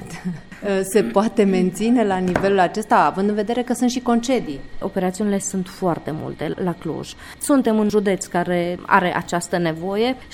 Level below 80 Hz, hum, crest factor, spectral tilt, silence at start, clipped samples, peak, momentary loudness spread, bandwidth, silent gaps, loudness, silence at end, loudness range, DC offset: -46 dBFS; none; 20 dB; -5.5 dB/octave; 0 s; under 0.1%; 0 dBFS; 11 LU; 17 kHz; none; -20 LUFS; 0 s; 5 LU; under 0.1%